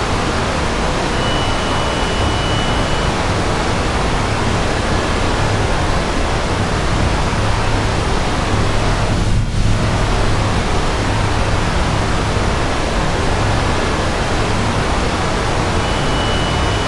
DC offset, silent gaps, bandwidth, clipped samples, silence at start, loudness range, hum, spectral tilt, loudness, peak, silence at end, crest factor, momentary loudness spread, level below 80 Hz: under 0.1%; none; 11.5 kHz; under 0.1%; 0 s; 0 LU; none; -5 dB/octave; -17 LUFS; -2 dBFS; 0 s; 14 dB; 1 LU; -22 dBFS